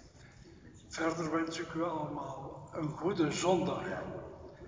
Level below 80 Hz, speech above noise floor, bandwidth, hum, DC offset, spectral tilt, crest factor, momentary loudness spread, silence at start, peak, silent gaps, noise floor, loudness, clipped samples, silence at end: -62 dBFS; 21 dB; 7.6 kHz; none; under 0.1%; -5 dB/octave; 20 dB; 24 LU; 0 s; -16 dBFS; none; -56 dBFS; -35 LUFS; under 0.1%; 0 s